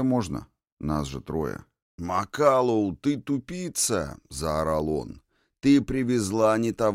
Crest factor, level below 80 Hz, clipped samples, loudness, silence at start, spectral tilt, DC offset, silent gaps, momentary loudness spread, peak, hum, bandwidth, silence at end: 18 dB; -46 dBFS; under 0.1%; -26 LUFS; 0 s; -5.5 dB/octave; under 0.1%; 0.72-0.77 s, 1.82-1.98 s; 12 LU; -6 dBFS; none; 16 kHz; 0 s